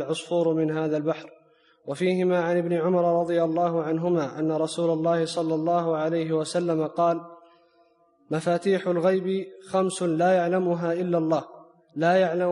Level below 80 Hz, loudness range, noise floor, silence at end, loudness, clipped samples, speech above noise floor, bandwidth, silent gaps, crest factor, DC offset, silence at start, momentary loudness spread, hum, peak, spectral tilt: -74 dBFS; 3 LU; -62 dBFS; 0 s; -25 LUFS; under 0.1%; 38 dB; 11.5 kHz; none; 14 dB; under 0.1%; 0 s; 6 LU; none; -10 dBFS; -6.5 dB/octave